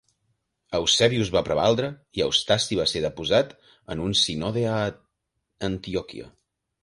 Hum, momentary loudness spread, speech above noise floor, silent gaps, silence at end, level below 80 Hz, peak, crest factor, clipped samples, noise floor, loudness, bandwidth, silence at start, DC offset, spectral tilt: none; 11 LU; 54 dB; none; 0.55 s; -50 dBFS; -4 dBFS; 22 dB; under 0.1%; -78 dBFS; -24 LUFS; 11.5 kHz; 0.7 s; under 0.1%; -4 dB/octave